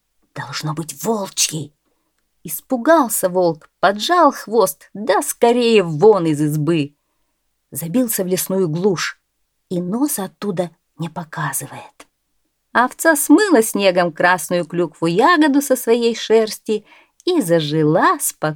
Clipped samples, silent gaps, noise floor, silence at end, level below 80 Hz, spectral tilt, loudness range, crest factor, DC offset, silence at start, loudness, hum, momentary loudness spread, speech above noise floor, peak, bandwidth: under 0.1%; none; -70 dBFS; 0 s; -66 dBFS; -4.5 dB/octave; 7 LU; 18 dB; under 0.1%; 0.35 s; -17 LUFS; none; 14 LU; 53 dB; 0 dBFS; 19 kHz